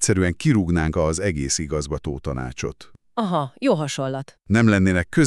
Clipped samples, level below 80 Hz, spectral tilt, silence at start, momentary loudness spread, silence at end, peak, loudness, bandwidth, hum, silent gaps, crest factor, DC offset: under 0.1%; -38 dBFS; -5.5 dB/octave; 0 s; 11 LU; 0 s; -4 dBFS; -22 LUFS; 12.5 kHz; none; none; 18 dB; under 0.1%